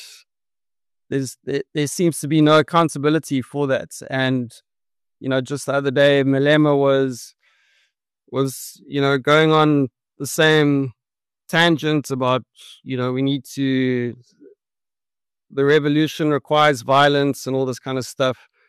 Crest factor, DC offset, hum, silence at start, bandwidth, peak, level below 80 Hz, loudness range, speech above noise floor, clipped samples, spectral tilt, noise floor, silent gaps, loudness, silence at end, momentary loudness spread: 16 dB; under 0.1%; none; 0 s; 13 kHz; -4 dBFS; -64 dBFS; 4 LU; over 72 dB; under 0.1%; -5.5 dB/octave; under -90 dBFS; none; -19 LUFS; 0.35 s; 12 LU